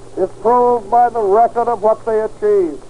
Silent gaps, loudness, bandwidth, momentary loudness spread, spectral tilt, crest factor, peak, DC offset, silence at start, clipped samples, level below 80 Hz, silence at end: none; -15 LUFS; 10.5 kHz; 5 LU; -7 dB/octave; 12 dB; -2 dBFS; 2%; 0.15 s; under 0.1%; -46 dBFS; 0.05 s